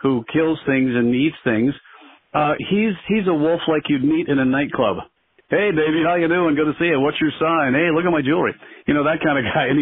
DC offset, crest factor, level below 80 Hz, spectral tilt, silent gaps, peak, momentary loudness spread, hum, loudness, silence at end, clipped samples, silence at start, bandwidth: under 0.1%; 14 dB; -52 dBFS; -4.5 dB/octave; none; -4 dBFS; 4 LU; none; -19 LUFS; 0 s; under 0.1%; 0.05 s; 3.9 kHz